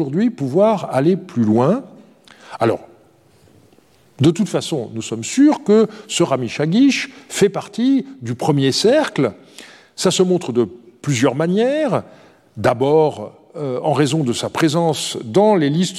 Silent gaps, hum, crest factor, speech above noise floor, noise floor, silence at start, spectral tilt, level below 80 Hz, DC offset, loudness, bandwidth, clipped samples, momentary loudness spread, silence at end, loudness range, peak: none; none; 16 dB; 36 dB; -53 dBFS; 0 s; -5.5 dB/octave; -62 dBFS; under 0.1%; -17 LUFS; 14 kHz; under 0.1%; 10 LU; 0 s; 4 LU; -2 dBFS